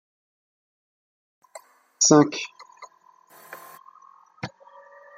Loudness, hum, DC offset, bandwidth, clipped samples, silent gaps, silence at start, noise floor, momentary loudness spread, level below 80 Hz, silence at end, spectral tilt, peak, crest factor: -19 LUFS; none; under 0.1%; 15.5 kHz; under 0.1%; none; 2 s; -56 dBFS; 27 LU; -72 dBFS; 0.7 s; -3.5 dB/octave; -2 dBFS; 26 dB